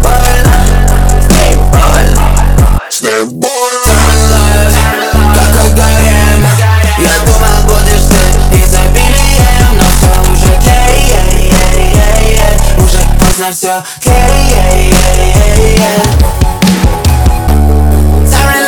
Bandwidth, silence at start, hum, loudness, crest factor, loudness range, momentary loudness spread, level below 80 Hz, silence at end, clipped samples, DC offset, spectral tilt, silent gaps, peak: over 20 kHz; 0 s; none; -8 LUFS; 6 dB; 1 LU; 2 LU; -8 dBFS; 0 s; 0.4%; 20%; -4.5 dB/octave; none; 0 dBFS